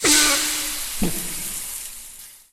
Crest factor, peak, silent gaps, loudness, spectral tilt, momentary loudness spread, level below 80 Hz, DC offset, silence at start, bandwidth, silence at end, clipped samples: 20 dB; -2 dBFS; none; -21 LUFS; -1 dB/octave; 21 LU; -40 dBFS; under 0.1%; 0 s; 17.5 kHz; 0.15 s; under 0.1%